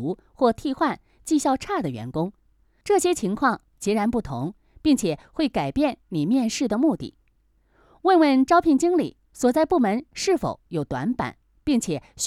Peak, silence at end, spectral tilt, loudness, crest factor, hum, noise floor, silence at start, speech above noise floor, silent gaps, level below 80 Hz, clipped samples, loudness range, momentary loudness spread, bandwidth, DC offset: -6 dBFS; 0 s; -5 dB/octave; -23 LUFS; 16 dB; none; -64 dBFS; 0 s; 41 dB; none; -50 dBFS; under 0.1%; 4 LU; 13 LU; 15 kHz; under 0.1%